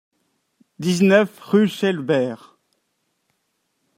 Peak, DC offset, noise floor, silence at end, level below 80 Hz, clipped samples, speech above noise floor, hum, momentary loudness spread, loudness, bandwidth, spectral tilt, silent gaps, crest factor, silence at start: -2 dBFS; under 0.1%; -72 dBFS; 1.6 s; -68 dBFS; under 0.1%; 54 dB; none; 12 LU; -19 LUFS; 15.5 kHz; -6 dB/octave; none; 20 dB; 0.8 s